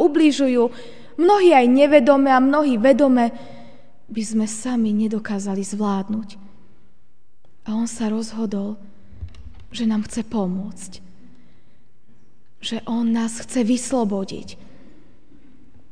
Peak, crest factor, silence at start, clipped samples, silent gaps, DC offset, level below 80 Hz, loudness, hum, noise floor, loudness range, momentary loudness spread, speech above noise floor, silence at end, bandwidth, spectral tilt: 0 dBFS; 20 dB; 0 s; under 0.1%; none; 2%; -52 dBFS; -19 LUFS; none; -64 dBFS; 13 LU; 23 LU; 46 dB; 1.35 s; 10 kHz; -5.5 dB/octave